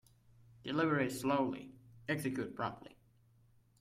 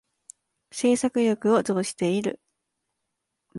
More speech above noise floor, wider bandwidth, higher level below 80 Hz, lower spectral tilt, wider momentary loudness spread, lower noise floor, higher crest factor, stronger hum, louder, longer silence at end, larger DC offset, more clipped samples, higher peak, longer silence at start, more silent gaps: second, 32 dB vs 57 dB; first, 16 kHz vs 11.5 kHz; about the same, -72 dBFS vs -68 dBFS; about the same, -5.5 dB/octave vs -5 dB/octave; first, 16 LU vs 11 LU; second, -68 dBFS vs -81 dBFS; about the same, 18 dB vs 18 dB; neither; second, -37 LUFS vs -24 LUFS; first, 0.95 s vs 0 s; neither; neither; second, -20 dBFS vs -10 dBFS; about the same, 0.65 s vs 0.75 s; neither